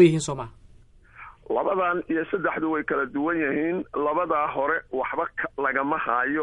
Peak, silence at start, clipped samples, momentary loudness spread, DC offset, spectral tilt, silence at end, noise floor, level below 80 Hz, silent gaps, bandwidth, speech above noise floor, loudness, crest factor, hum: -6 dBFS; 0 s; under 0.1%; 6 LU; under 0.1%; -6 dB/octave; 0 s; -52 dBFS; -56 dBFS; none; 11 kHz; 28 dB; -25 LUFS; 20 dB; none